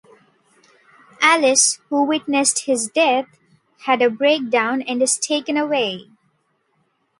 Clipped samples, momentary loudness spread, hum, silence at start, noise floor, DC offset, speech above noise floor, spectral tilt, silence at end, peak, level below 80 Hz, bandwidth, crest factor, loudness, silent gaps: under 0.1%; 7 LU; none; 1.2 s; -66 dBFS; under 0.1%; 48 dB; -1 dB/octave; 1.15 s; 0 dBFS; -72 dBFS; 11.5 kHz; 20 dB; -18 LUFS; none